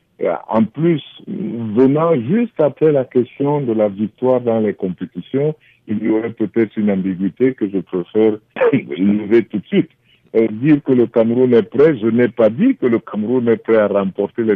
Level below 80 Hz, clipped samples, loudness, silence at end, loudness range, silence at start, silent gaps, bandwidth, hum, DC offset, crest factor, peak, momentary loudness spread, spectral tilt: -62 dBFS; under 0.1%; -16 LUFS; 0 s; 4 LU; 0.2 s; none; 4.4 kHz; none; under 0.1%; 12 dB; -4 dBFS; 8 LU; -10.5 dB/octave